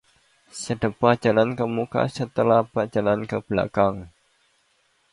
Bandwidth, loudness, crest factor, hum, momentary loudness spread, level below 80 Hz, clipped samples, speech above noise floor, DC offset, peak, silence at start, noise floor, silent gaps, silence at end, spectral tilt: 11.5 kHz; -23 LUFS; 22 dB; none; 8 LU; -54 dBFS; under 0.1%; 44 dB; under 0.1%; -2 dBFS; 0.55 s; -66 dBFS; none; 1.05 s; -6.5 dB/octave